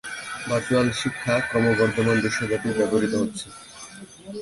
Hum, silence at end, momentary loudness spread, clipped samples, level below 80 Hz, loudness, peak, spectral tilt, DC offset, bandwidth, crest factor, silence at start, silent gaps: none; 0 s; 19 LU; under 0.1%; -52 dBFS; -23 LUFS; -8 dBFS; -5 dB/octave; under 0.1%; 11.5 kHz; 16 dB; 0.05 s; none